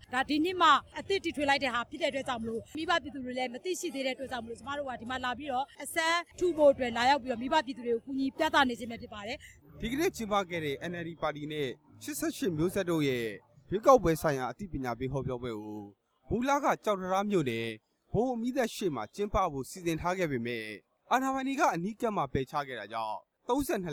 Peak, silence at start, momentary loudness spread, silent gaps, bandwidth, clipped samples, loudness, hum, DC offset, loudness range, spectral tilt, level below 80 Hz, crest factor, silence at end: -8 dBFS; 0.1 s; 13 LU; none; 19.5 kHz; under 0.1%; -31 LUFS; none; under 0.1%; 5 LU; -4.5 dB/octave; -54 dBFS; 22 dB; 0 s